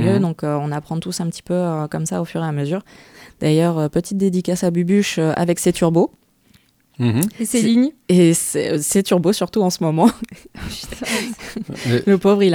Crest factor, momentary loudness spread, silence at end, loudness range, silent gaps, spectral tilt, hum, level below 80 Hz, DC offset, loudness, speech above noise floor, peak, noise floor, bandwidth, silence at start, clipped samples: 18 dB; 11 LU; 0 s; 5 LU; none; -5.5 dB/octave; none; -48 dBFS; under 0.1%; -18 LUFS; 37 dB; 0 dBFS; -55 dBFS; 18.5 kHz; 0 s; under 0.1%